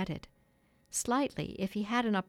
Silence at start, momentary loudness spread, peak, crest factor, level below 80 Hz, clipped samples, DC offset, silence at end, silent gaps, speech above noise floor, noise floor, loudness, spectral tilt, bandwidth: 0 s; 8 LU; -18 dBFS; 18 dB; -60 dBFS; under 0.1%; under 0.1%; 0.05 s; none; 36 dB; -69 dBFS; -34 LUFS; -4 dB/octave; 17 kHz